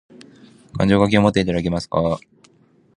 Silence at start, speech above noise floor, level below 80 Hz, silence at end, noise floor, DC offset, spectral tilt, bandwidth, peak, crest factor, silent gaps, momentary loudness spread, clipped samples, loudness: 0.75 s; 38 dB; -42 dBFS; 0.8 s; -55 dBFS; under 0.1%; -7 dB/octave; 10.5 kHz; 0 dBFS; 20 dB; none; 10 LU; under 0.1%; -19 LUFS